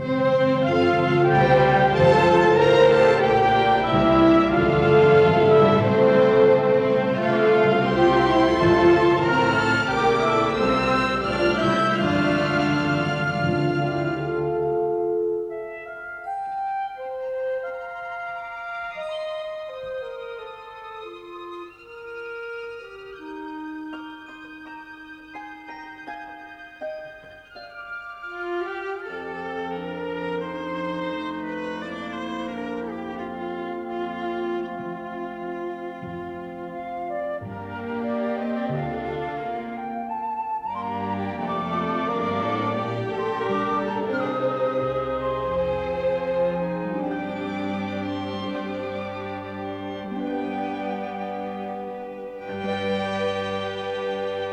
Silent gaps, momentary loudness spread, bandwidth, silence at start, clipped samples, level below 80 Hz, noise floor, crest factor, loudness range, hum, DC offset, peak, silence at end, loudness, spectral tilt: none; 19 LU; 9.6 kHz; 0 s; under 0.1%; -50 dBFS; -43 dBFS; 18 dB; 19 LU; none; under 0.1%; -4 dBFS; 0 s; -23 LUFS; -7 dB/octave